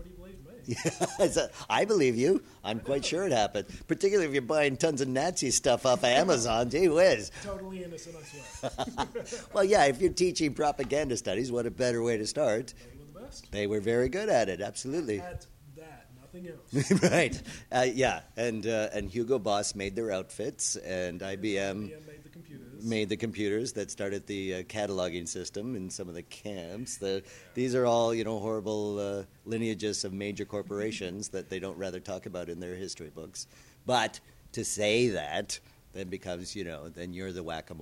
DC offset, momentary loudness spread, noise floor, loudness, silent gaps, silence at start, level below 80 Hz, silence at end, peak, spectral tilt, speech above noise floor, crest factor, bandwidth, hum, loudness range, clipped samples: under 0.1%; 17 LU; -52 dBFS; -30 LUFS; none; 0 s; -56 dBFS; 0 s; -10 dBFS; -4 dB/octave; 21 dB; 20 dB; 16 kHz; none; 8 LU; under 0.1%